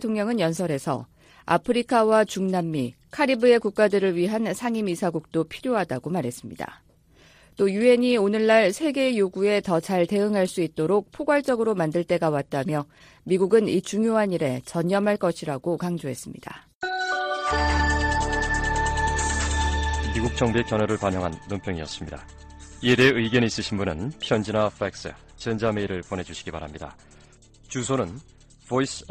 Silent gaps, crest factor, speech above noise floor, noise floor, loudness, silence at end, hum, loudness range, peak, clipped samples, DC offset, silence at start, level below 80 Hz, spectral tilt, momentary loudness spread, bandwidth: 16.75-16.81 s; 18 dB; 32 dB; -55 dBFS; -24 LUFS; 0.05 s; none; 6 LU; -6 dBFS; under 0.1%; under 0.1%; 0 s; -38 dBFS; -5.5 dB/octave; 14 LU; 15 kHz